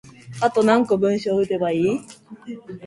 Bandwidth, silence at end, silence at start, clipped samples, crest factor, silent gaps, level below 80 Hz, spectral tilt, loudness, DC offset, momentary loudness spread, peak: 11.5 kHz; 0 s; 0.05 s; under 0.1%; 18 dB; none; -62 dBFS; -6.5 dB/octave; -20 LUFS; under 0.1%; 20 LU; -2 dBFS